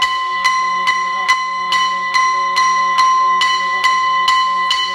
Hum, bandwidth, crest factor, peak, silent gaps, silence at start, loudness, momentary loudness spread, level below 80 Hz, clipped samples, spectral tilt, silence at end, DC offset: none; 13 kHz; 14 dB; -2 dBFS; none; 0 s; -14 LUFS; 3 LU; -58 dBFS; under 0.1%; 1 dB/octave; 0 s; under 0.1%